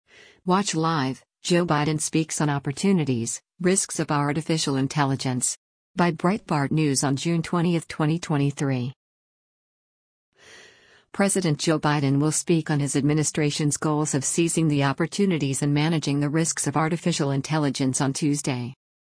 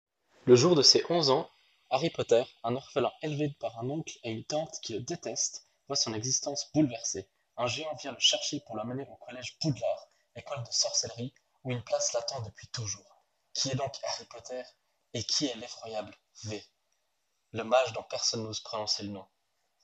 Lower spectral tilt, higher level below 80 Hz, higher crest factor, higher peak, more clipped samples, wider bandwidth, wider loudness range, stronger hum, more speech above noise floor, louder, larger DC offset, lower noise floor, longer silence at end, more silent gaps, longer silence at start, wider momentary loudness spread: first, -5 dB/octave vs -3.5 dB/octave; first, -60 dBFS vs -74 dBFS; second, 16 dB vs 26 dB; about the same, -8 dBFS vs -6 dBFS; neither; first, 10.5 kHz vs 8.8 kHz; about the same, 5 LU vs 7 LU; neither; second, 31 dB vs 49 dB; first, -24 LUFS vs -30 LUFS; neither; second, -55 dBFS vs -80 dBFS; second, 0.25 s vs 0.6 s; first, 5.57-5.94 s, 8.96-10.32 s vs none; about the same, 0.45 s vs 0.45 s; second, 5 LU vs 16 LU